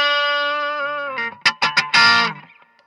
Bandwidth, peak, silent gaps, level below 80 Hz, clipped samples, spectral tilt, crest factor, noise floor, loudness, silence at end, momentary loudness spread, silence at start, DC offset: 12 kHz; 0 dBFS; none; -72 dBFS; under 0.1%; -1.5 dB/octave; 18 dB; -45 dBFS; -17 LUFS; 0.45 s; 11 LU; 0 s; under 0.1%